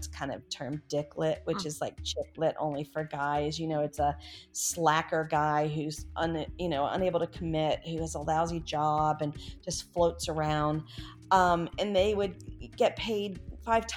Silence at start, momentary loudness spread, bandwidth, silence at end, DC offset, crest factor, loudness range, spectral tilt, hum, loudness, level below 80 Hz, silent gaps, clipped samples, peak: 0 s; 10 LU; 17.5 kHz; 0 s; under 0.1%; 20 dB; 3 LU; -4.5 dB/octave; none; -31 LUFS; -50 dBFS; none; under 0.1%; -10 dBFS